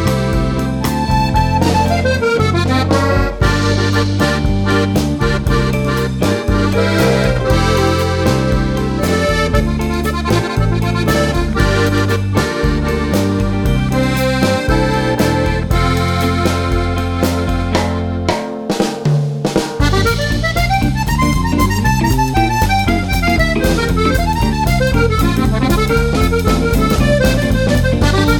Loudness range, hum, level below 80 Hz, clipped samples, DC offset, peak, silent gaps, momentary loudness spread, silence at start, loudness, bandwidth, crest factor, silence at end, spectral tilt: 2 LU; none; -22 dBFS; under 0.1%; under 0.1%; 0 dBFS; none; 3 LU; 0 s; -15 LUFS; 19 kHz; 12 dB; 0 s; -6 dB/octave